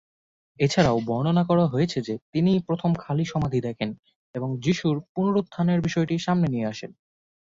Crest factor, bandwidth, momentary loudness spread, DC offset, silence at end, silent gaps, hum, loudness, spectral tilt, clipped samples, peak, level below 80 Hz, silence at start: 20 dB; 7.8 kHz; 10 LU; under 0.1%; 0.65 s; 2.22-2.33 s, 4.16-4.34 s, 5.09-5.15 s; none; -24 LUFS; -7 dB/octave; under 0.1%; -4 dBFS; -54 dBFS; 0.6 s